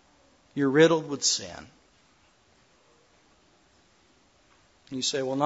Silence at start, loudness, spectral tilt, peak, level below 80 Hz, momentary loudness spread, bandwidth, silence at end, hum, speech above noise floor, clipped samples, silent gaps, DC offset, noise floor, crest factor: 0.55 s; -25 LUFS; -3.5 dB/octave; -6 dBFS; -70 dBFS; 19 LU; 8 kHz; 0 s; none; 38 dB; under 0.1%; none; under 0.1%; -63 dBFS; 24 dB